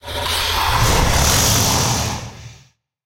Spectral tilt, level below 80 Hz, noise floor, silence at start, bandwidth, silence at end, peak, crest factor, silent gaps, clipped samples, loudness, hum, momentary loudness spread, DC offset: -2.5 dB/octave; -26 dBFS; -51 dBFS; 0.05 s; 16.5 kHz; 0.55 s; -2 dBFS; 16 dB; none; under 0.1%; -16 LUFS; none; 10 LU; under 0.1%